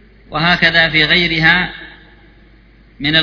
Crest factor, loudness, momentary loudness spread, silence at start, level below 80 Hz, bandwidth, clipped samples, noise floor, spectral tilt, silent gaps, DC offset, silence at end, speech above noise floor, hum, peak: 16 dB; -12 LUFS; 13 LU; 0.3 s; -38 dBFS; 5.4 kHz; under 0.1%; -45 dBFS; -5.5 dB/octave; none; under 0.1%; 0 s; 32 dB; none; 0 dBFS